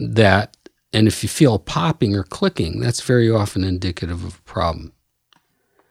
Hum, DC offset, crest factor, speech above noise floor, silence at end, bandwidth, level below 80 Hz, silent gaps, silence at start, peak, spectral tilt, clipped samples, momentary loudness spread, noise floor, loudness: none; under 0.1%; 20 dB; 45 dB; 1.05 s; 15 kHz; -42 dBFS; none; 0 s; 0 dBFS; -5.5 dB/octave; under 0.1%; 12 LU; -63 dBFS; -19 LUFS